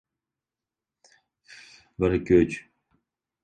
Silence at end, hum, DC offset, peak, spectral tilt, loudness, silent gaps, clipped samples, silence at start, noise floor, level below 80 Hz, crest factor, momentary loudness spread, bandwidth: 0.85 s; none; under 0.1%; -6 dBFS; -7.5 dB/octave; -23 LUFS; none; under 0.1%; 2 s; -90 dBFS; -48 dBFS; 22 dB; 18 LU; 9 kHz